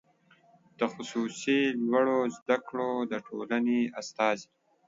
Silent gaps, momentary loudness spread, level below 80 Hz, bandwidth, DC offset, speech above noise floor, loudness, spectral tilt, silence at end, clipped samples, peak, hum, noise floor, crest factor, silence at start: 2.42-2.46 s; 7 LU; -78 dBFS; 7.8 kHz; under 0.1%; 34 dB; -30 LUFS; -4.5 dB/octave; 0.45 s; under 0.1%; -12 dBFS; none; -63 dBFS; 18 dB; 0.8 s